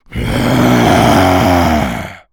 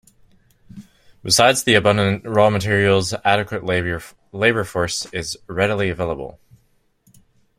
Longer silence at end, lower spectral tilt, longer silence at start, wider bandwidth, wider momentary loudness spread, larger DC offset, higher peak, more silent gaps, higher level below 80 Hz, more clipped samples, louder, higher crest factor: second, 0.15 s vs 1.3 s; first, -5.5 dB/octave vs -4 dB/octave; second, 0.1 s vs 0.75 s; first, over 20 kHz vs 16 kHz; second, 9 LU vs 13 LU; neither; about the same, 0 dBFS vs 0 dBFS; neither; first, -28 dBFS vs -48 dBFS; neither; first, -11 LUFS vs -18 LUFS; second, 10 dB vs 20 dB